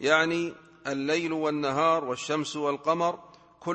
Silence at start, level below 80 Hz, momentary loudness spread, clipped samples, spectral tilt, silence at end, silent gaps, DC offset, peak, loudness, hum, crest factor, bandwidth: 0 s; -70 dBFS; 12 LU; under 0.1%; -4.5 dB/octave; 0 s; none; under 0.1%; -8 dBFS; -27 LUFS; none; 20 dB; 8.8 kHz